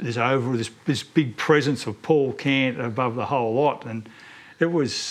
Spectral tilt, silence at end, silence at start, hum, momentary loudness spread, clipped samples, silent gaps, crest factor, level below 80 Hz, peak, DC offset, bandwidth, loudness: -5.5 dB/octave; 0 s; 0 s; none; 8 LU; under 0.1%; none; 18 dB; -68 dBFS; -6 dBFS; under 0.1%; 13.5 kHz; -23 LUFS